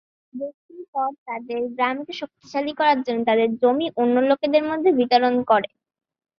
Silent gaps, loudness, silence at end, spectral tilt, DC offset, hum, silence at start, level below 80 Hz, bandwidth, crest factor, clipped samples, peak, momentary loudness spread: 0.54-0.69 s, 0.88-0.93 s, 1.18-1.26 s; -21 LUFS; 0.7 s; -6 dB/octave; under 0.1%; none; 0.35 s; -68 dBFS; 6.6 kHz; 18 dB; under 0.1%; -4 dBFS; 15 LU